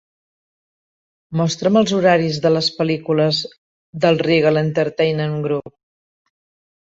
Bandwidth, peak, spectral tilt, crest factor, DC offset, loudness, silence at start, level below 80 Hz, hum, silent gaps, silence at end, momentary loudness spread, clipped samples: 8 kHz; -2 dBFS; -6 dB/octave; 18 dB; under 0.1%; -17 LUFS; 1.3 s; -58 dBFS; none; 3.58-3.93 s; 1.15 s; 8 LU; under 0.1%